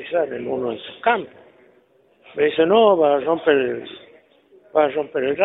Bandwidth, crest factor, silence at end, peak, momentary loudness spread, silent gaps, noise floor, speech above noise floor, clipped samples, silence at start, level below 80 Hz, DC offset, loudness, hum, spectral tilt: 4 kHz; 18 dB; 0 s; -2 dBFS; 14 LU; none; -57 dBFS; 38 dB; under 0.1%; 0 s; -64 dBFS; under 0.1%; -19 LUFS; none; -9 dB/octave